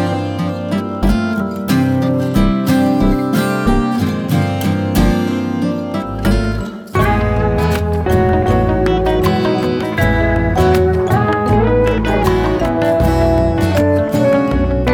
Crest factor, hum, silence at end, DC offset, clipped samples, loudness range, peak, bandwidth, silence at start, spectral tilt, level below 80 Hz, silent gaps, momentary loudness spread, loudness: 12 dB; none; 0 s; under 0.1%; under 0.1%; 3 LU; -2 dBFS; over 20 kHz; 0 s; -7 dB/octave; -24 dBFS; none; 5 LU; -15 LUFS